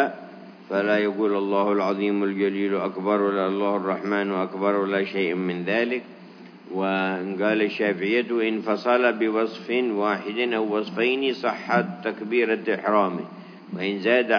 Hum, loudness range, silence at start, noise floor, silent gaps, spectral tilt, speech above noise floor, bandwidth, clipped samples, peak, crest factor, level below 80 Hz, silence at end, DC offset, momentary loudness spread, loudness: none; 2 LU; 0 s; -44 dBFS; none; -7 dB/octave; 21 dB; 5.4 kHz; under 0.1%; -6 dBFS; 18 dB; -88 dBFS; 0 s; under 0.1%; 7 LU; -24 LUFS